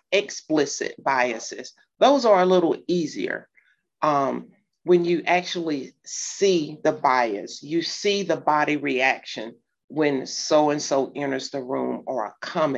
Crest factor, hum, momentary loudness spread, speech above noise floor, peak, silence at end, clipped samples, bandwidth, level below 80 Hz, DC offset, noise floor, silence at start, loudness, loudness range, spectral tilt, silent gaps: 18 dB; none; 12 LU; 39 dB; -4 dBFS; 0 s; under 0.1%; 8.2 kHz; -74 dBFS; under 0.1%; -62 dBFS; 0.1 s; -23 LUFS; 3 LU; -4 dB/octave; 9.84-9.88 s